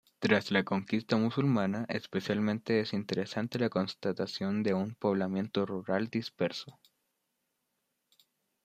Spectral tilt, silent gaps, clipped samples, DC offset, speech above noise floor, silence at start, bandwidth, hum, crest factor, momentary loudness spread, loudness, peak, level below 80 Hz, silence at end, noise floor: -6.5 dB/octave; none; under 0.1%; under 0.1%; 50 dB; 0.2 s; 13.5 kHz; none; 24 dB; 6 LU; -32 LUFS; -8 dBFS; -74 dBFS; 1.95 s; -82 dBFS